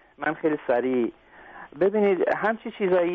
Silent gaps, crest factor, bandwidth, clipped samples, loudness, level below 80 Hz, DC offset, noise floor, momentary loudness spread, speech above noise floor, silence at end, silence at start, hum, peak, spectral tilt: none; 14 dB; 4.7 kHz; under 0.1%; -25 LUFS; -66 dBFS; under 0.1%; -46 dBFS; 8 LU; 22 dB; 0 s; 0.2 s; none; -10 dBFS; -5 dB/octave